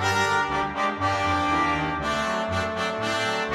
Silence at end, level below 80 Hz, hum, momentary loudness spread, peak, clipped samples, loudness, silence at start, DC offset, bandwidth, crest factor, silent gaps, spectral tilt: 0 s; -46 dBFS; none; 4 LU; -10 dBFS; under 0.1%; -24 LUFS; 0 s; under 0.1%; 16 kHz; 14 dB; none; -4 dB/octave